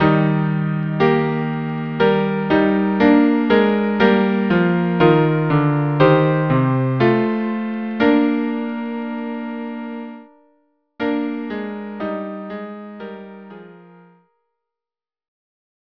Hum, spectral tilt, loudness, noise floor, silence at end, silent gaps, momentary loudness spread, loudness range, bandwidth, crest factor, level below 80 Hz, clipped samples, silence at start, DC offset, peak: none; -9.5 dB/octave; -18 LUFS; under -90 dBFS; 2.2 s; none; 16 LU; 15 LU; 5.4 kHz; 18 dB; -52 dBFS; under 0.1%; 0 s; under 0.1%; 0 dBFS